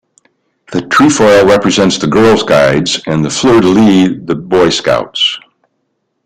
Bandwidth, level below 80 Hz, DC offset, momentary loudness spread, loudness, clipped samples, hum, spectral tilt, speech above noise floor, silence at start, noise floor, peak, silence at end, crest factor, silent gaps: 15 kHz; -40 dBFS; under 0.1%; 7 LU; -9 LUFS; under 0.1%; none; -4.5 dB/octave; 57 dB; 0.7 s; -65 dBFS; 0 dBFS; 0.85 s; 10 dB; none